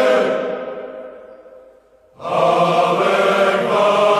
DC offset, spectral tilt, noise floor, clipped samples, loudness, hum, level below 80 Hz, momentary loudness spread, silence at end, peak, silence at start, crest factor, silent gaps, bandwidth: under 0.1%; -5 dB/octave; -50 dBFS; under 0.1%; -16 LUFS; none; -62 dBFS; 17 LU; 0 s; -2 dBFS; 0 s; 14 dB; none; 13.5 kHz